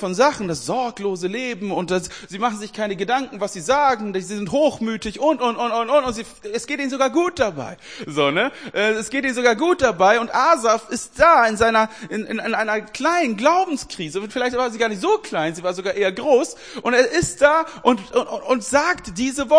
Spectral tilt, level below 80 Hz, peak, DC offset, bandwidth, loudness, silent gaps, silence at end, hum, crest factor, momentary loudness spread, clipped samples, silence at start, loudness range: -4 dB/octave; -50 dBFS; 0 dBFS; 0.2%; 10.5 kHz; -20 LUFS; none; 0 s; none; 20 dB; 10 LU; under 0.1%; 0 s; 5 LU